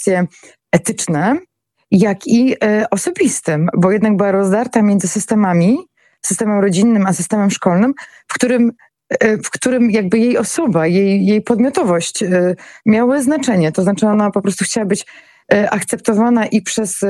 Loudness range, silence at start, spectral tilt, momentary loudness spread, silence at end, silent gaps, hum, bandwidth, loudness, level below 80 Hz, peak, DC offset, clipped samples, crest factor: 1 LU; 0 s; -5.5 dB/octave; 5 LU; 0 s; none; none; 13.5 kHz; -15 LUFS; -58 dBFS; 0 dBFS; under 0.1%; under 0.1%; 14 dB